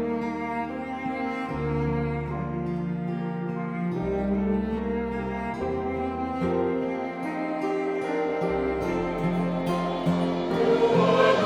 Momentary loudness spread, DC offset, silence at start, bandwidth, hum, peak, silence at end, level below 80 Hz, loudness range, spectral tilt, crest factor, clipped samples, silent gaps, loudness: 8 LU; under 0.1%; 0 s; 10.5 kHz; none; -6 dBFS; 0 s; -44 dBFS; 4 LU; -7.5 dB/octave; 20 dB; under 0.1%; none; -27 LUFS